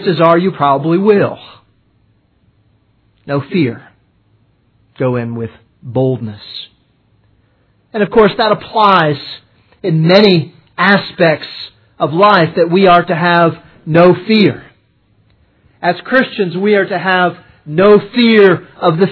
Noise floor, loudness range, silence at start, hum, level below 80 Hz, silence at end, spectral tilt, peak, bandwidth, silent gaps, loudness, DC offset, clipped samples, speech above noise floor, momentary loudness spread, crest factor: -55 dBFS; 10 LU; 0 s; none; -50 dBFS; 0 s; -8.5 dB/octave; 0 dBFS; 5.4 kHz; none; -11 LUFS; under 0.1%; 0.2%; 44 dB; 17 LU; 12 dB